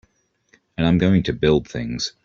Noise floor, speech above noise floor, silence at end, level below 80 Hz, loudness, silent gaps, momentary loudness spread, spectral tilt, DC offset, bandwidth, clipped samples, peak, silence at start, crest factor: -63 dBFS; 43 dB; 0.15 s; -42 dBFS; -20 LUFS; none; 10 LU; -6.5 dB/octave; under 0.1%; 7.6 kHz; under 0.1%; -4 dBFS; 0.8 s; 18 dB